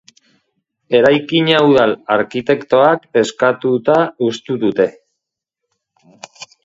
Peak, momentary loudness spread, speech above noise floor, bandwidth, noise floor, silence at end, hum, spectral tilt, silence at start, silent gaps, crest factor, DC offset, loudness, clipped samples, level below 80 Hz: 0 dBFS; 7 LU; 65 dB; 8 kHz; -79 dBFS; 0.2 s; none; -5.5 dB/octave; 0.9 s; none; 16 dB; under 0.1%; -14 LUFS; under 0.1%; -58 dBFS